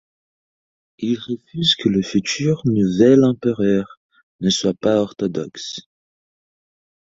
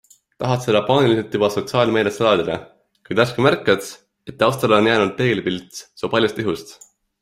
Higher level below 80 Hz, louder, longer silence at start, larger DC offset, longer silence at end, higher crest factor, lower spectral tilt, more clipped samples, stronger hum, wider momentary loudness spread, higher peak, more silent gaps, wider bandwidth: about the same, -54 dBFS vs -56 dBFS; about the same, -18 LUFS vs -19 LUFS; first, 1 s vs 0.4 s; neither; first, 1.4 s vs 0.5 s; about the same, 18 dB vs 18 dB; about the same, -5.5 dB/octave vs -5.5 dB/octave; neither; neither; about the same, 15 LU vs 13 LU; about the same, -2 dBFS vs 0 dBFS; first, 3.97-4.09 s, 4.23-4.39 s vs none; second, 7.8 kHz vs 16 kHz